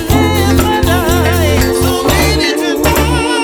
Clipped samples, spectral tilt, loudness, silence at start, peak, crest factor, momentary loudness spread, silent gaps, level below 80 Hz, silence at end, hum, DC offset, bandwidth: under 0.1%; -5 dB/octave; -11 LUFS; 0 s; 0 dBFS; 10 dB; 2 LU; none; -20 dBFS; 0 s; none; under 0.1%; 19.5 kHz